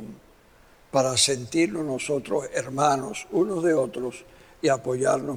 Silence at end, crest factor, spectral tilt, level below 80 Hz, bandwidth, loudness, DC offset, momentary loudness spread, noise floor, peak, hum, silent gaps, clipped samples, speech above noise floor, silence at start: 0 s; 20 dB; -3.5 dB/octave; -60 dBFS; 16.5 kHz; -25 LUFS; under 0.1%; 9 LU; -55 dBFS; -6 dBFS; none; none; under 0.1%; 30 dB; 0 s